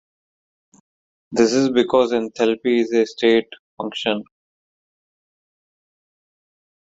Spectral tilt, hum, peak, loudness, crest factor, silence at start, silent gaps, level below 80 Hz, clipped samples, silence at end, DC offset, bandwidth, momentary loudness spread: -4.5 dB/octave; none; -2 dBFS; -19 LUFS; 20 dB; 1.3 s; 3.59-3.77 s; -62 dBFS; under 0.1%; 2.65 s; under 0.1%; 7.8 kHz; 9 LU